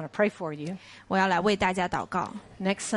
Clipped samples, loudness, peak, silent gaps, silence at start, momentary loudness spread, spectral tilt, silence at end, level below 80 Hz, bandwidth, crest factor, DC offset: under 0.1%; -28 LUFS; -10 dBFS; none; 0 s; 13 LU; -4.5 dB/octave; 0 s; -56 dBFS; 11.5 kHz; 18 dB; under 0.1%